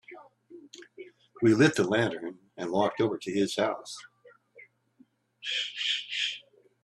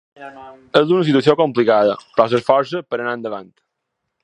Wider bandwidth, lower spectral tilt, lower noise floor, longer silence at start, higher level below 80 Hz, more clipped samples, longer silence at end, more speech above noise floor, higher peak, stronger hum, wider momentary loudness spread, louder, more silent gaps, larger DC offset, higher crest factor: first, 12.5 kHz vs 10 kHz; second, -4.5 dB/octave vs -7 dB/octave; second, -64 dBFS vs -76 dBFS; about the same, 0.1 s vs 0.2 s; second, -70 dBFS vs -64 dBFS; neither; second, 0.45 s vs 0.8 s; second, 37 dB vs 60 dB; second, -8 dBFS vs 0 dBFS; neither; first, 26 LU vs 17 LU; second, -28 LUFS vs -16 LUFS; neither; neither; about the same, 22 dB vs 18 dB